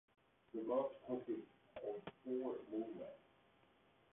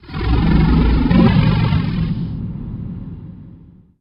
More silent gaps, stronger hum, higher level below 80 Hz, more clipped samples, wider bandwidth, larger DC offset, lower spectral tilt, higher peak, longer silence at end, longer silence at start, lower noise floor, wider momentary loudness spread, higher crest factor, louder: neither; neither; second, -84 dBFS vs -22 dBFS; neither; second, 3.9 kHz vs 5.6 kHz; neither; second, -4 dB/octave vs -10 dB/octave; second, -28 dBFS vs 0 dBFS; first, 0.95 s vs 0.45 s; first, 0.55 s vs 0.05 s; first, -73 dBFS vs -43 dBFS; second, 12 LU vs 18 LU; about the same, 18 dB vs 16 dB; second, -46 LUFS vs -16 LUFS